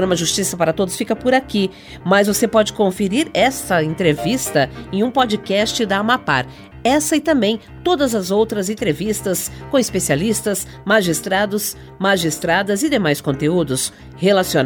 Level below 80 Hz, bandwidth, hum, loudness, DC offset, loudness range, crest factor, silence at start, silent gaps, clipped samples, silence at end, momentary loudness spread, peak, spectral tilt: -44 dBFS; over 20 kHz; none; -18 LUFS; under 0.1%; 2 LU; 16 dB; 0 s; none; under 0.1%; 0 s; 6 LU; -2 dBFS; -4 dB/octave